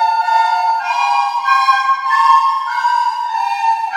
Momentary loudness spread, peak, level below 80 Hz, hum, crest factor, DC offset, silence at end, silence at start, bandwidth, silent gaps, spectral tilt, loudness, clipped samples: 5 LU; 0 dBFS; -84 dBFS; none; 14 dB; under 0.1%; 0 s; 0 s; 13 kHz; none; 2.5 dB/octave; -14 LUFS; under 0.1%